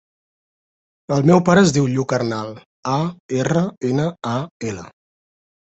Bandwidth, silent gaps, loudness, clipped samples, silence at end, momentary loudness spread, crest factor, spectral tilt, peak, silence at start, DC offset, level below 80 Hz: 8.2 kHz; 2.66-2.83 s, 3.20-3.29 s, 3.77-3.81 s, 4.51-4.60 s; -19 LUFS; under 0.1%; 0.7 s; 15 LU; 18 dB; -6 dB/octave; -2 dBFS; 1.1 s; under 0.1%; -54 dBFS